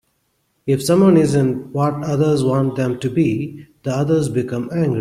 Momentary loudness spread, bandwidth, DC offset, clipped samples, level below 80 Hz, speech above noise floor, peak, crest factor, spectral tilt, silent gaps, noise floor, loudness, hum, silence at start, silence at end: 11 LU; 15 kHz; under 0.1%; under 0.1%; -52 dBFS; 49 dB; -2 dBFS; 14 dB; -7.5 dB/octave; none; -66 dBFS; -18 LUFS; none; 0.65 s; 0 s